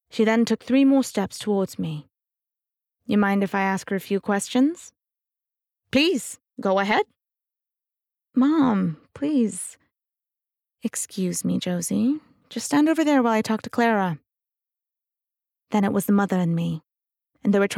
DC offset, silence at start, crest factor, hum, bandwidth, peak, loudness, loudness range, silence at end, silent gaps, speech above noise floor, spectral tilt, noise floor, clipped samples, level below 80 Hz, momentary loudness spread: under 0.1%; 0.15 s; 16 dB; none; 16 kHz; -8 dBFS; -23 LUFS; 3 LU; 0 s; none; 65 dB; -5 dB/octave; -87 dBFS; under 0.1%; -68 dBFS; 12 LU